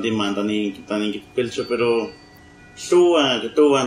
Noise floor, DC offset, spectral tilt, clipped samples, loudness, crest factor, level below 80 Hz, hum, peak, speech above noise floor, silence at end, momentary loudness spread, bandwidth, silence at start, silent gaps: -46 dBFS; under 0.1%; -4.5 dB/octave; under 0.1%; -20 LUFS; 16 dB; -58 dBFS; none; -4 dBFS; 26 dB; 0 s; 9 LU; 10.5 kHz; 0 s; none